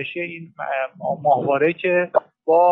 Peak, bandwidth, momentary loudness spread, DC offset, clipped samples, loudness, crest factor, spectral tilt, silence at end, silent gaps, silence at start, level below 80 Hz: -4 dBFS; 4.1 kHz; 11 LU; under 0.1%; under 0.1%; -21 LUFS; 14 dB; -8.5 dB/octave; 0 s; none; 0 s; -72 dBFS